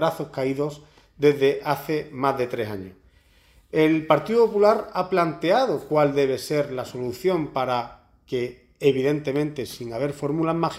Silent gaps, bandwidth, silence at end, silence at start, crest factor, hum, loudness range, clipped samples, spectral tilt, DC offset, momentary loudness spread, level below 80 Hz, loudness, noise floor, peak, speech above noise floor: none; 16 kHz; 0 s; 0 s; 20 dB; none; 5 LU; under 0.1%; -6.5 dB/octave; under 0.1%; 11 LU; -58 dBFS; -23 LUFS; -57 dBFS; -4 dBFS; 34 dB